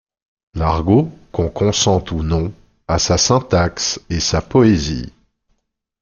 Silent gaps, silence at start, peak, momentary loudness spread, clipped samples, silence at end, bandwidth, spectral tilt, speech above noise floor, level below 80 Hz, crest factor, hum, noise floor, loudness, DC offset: none; 0.55 s; -2 dBFS; 10 LU; under 0.1%; 0.9 s; 7.4 kHz; -5 dB/octave; 52 dB; -34 dBFS; 16 dB; none; -68 dBFS; -17 LUFS; under 0.1%